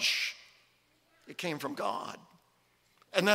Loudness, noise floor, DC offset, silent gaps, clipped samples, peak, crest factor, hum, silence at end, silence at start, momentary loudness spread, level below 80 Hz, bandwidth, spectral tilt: -35 LUFS; -70 dBFS; under 0.1%; none; under 0.1%; -8 dBFS; 28 dB; none; 0 s; 0 s; 18 LU; -82 dBFS; 16 kHz; -2.5 dB/octave